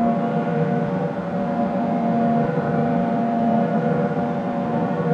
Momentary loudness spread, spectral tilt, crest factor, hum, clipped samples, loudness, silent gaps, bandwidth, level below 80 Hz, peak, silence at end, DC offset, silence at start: 4 LU; -9.5 dB/octave; 14 dB; none; under 0.1%; -21 LUFS; none; 6.6 kHz; -56 dBFS; -8 dBFS; 0 s; under 0.1%; 0 s